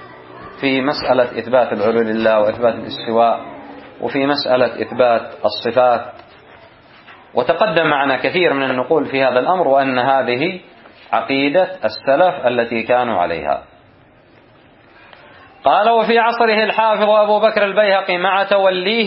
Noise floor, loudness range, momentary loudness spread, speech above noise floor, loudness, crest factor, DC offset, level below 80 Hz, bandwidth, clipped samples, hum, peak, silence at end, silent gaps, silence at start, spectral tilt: -48 dBFS; 5 LU; 8 LU; 33 dB; -16 LUFS; 16 dB; under 0.1%; -56 dBFS; 5.8 kHz; under 0.1%; none; 0 dBFS; 0 s; none; 0 s; -9 dB/octave